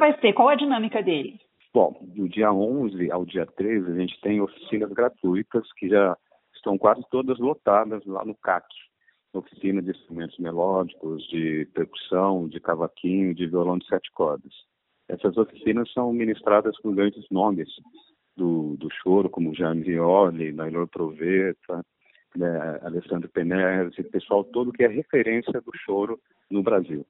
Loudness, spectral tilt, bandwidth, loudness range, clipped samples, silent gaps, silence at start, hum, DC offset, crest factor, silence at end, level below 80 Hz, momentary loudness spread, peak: -24 LUFS; -5 dB/octave; 4.1 kHz; 3 LU; under 0.1%; none; 0 s; none; under 0.1%; 20 dB; 0.05 s; -66 dBFS; 10 LU; -4 dBFS